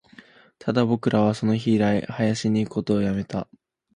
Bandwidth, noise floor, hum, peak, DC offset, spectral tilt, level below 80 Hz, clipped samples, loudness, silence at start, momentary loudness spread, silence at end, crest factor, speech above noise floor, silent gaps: 10 kHz; -51 dBFS; none; -6 dBFS; under 0.1%; -7 dB/octave; -54 dBFS; under 0.1%; -23 LUFS; 0.65 s; 10 LU; 0.55 s; 18 dB; 29 dB; none